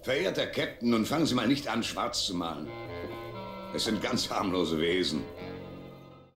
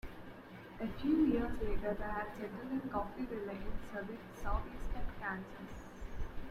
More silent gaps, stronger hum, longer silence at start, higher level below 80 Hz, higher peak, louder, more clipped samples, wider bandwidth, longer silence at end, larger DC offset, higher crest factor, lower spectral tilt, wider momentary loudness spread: neither; neither; about the same, 0 s vs 0.05 s; second, -56 dBFS vs -46 dBFS; first, -14 dBFS vs -20 dBFS; first, -30 LUFS vs -40 LUFS; neither; first, 16.5 kHz vs 13.5 kHz; about the same, 0.1 s vs 0 s; neither; about the same, 16 dB vs 18 dB; second, -4 dB/octave vs -7.5 dB/octave; second, 14 LU vs 17 LU